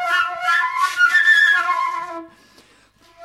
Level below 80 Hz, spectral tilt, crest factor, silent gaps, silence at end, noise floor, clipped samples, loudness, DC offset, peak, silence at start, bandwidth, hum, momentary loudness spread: -66 dBFS; 1 dB/octave; 14 dB; none; 0 s; -53 dBFS; under 0.1%; -15 LUFS; under 0.1%; -4 dBFS; 0 s; 15 kHz; none; 16 LU